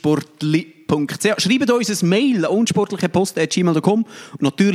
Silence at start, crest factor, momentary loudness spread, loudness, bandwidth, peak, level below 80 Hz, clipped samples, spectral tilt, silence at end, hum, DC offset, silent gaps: 0.05 s; 16 dB; 5 LU; -18 LUFS; 15.5 kHz; -2 dBFS; -58 dBFS; under 0.1%; -5 dB/octave; 0 s; none; under 0.1%; none